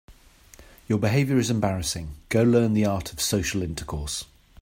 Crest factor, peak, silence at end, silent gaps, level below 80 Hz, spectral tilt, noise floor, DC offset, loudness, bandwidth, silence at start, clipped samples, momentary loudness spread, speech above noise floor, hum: 18 dB; -8 dBFS; 0.4 s; none; -44 dBFS; -5 dB/octave; -51 dBFS; under 0.1%; -24 LUFS; 16 kHz; 0.1 s; under 0.1%; 11 LU; 28 dB; none